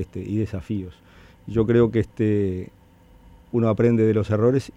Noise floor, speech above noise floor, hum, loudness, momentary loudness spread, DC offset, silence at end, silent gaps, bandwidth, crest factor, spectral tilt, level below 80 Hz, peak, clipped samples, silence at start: -51 dBFS; 30 dB; none; -22 LUFS; 12 LU; under 0.1%; 0.05 s; none; 10 kHz; 16 dB; -9 dB/octave; -46 dBFS; -8 dBFS; under 0.1%; 0 s